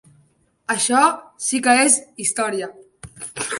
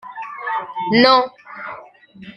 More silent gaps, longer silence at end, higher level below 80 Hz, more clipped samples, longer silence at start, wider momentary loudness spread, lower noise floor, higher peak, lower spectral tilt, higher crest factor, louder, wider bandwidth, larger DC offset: neither; about the same, 0 s vs 0.05 s; about the same, -62 dBFS vs -64 dBFS; neither; first, 0.7 s vs 0.05 s; about the same, 19 LU vs 21 LU; first, -60 dBFS vs -42 dBFS; about the same, -2 dBFS vs -2 dBFS; second, -1.5 dB/octave vs -6 dB/octave; about the same, 20 dB vs 18 dB; about the same, -18 LUFS vs -17 LUFS; first, 11.5 kHz vs 9.2 kHz; neither